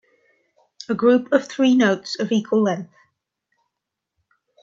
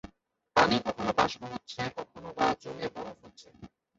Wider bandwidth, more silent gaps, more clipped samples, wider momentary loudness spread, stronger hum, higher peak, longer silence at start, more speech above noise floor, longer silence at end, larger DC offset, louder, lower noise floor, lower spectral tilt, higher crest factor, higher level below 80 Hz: about the same, 7.6 kHz vs 8 kHz; neither; neither; second, 13 LU vs 18 LU; neither; first, -2 dBFS vs -8 dBFS; first, 0.9 s vs 0.05 s; first, 64 dB vs 29 dB; first, 1.8 s vs 0.3 s; neither; first, -19 LUFS vs -30 LUFS; first, -82 dBFS vs -65 dBFS; about the same, -5.5 dB/octave vs -4.5 dB/octave; about the same, 20 dB vs 24 dB; second, -70 dBFS vs -60 dBFS